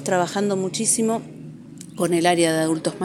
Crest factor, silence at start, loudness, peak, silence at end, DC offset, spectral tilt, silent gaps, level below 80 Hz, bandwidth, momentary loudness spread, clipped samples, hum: 18 dB; 0 s; -21 LUFS; -4 dBFS; 0 s; under 0.1%; -4 dB/octave; none; -66 dBFS; 17 kHz; 21 LU; under 0.1%; none